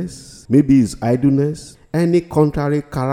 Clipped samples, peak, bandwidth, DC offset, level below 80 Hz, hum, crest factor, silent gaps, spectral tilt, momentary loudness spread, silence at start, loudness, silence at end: under 0.1%; 0 dBFS; 13.5 kHz; under 0.1%; -40 dBFS; none; 16 dB; none; -8 dB/octave; 12 LU; 0 s; -17 LUFS; 0 s